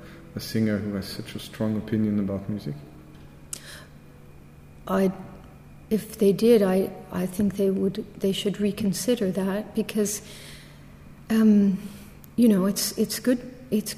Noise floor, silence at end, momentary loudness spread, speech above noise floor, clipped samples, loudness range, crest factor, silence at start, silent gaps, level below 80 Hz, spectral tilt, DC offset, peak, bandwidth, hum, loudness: -47 dBFS; 0 s; 20 LU; 23 dB; under 0.1%; 8 LU; 18 dB; 0 s; none; -54 dBFS; -5.5 dB/octave; under 0.1%; -8 dBFS; 15.5 kHz; none; -25 LUFS